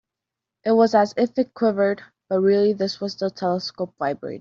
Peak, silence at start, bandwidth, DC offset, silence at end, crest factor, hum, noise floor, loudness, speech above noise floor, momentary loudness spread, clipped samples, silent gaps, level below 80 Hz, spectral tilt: -6 dBFS; 0.65 s; 7.4 kHz; under 0.1%; 0 s; 16 dB; none; -86 dBFS; -22 LUFS; 65 dB; 9 LU; under 0.1%; none; -68 dBFS; -6.5 dB/octave